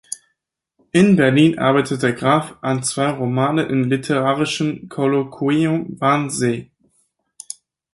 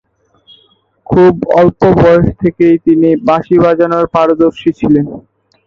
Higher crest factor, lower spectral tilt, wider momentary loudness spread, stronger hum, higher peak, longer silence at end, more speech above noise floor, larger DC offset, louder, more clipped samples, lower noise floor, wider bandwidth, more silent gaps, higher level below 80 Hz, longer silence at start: first, 16 dB vs 10 dB; second, -5.5 dB/octave vs -9 dB/octave; first, 12 LU vs 4 LU; neither; about the same, -2 dBFS vs 0 dBFS; first, 1.3 s vs 0.5 s; first, 58 dB vs 43 dB; neither; second, -18 LUFS vs -10 LUFS; neither; first, -75 dBFS vs -52 dBFS; first, 11.5 kHz vs 6.8 kHz; neither; second, -58 dBFS vs -36 dBFS; second, 0.1 s vs 1.1 s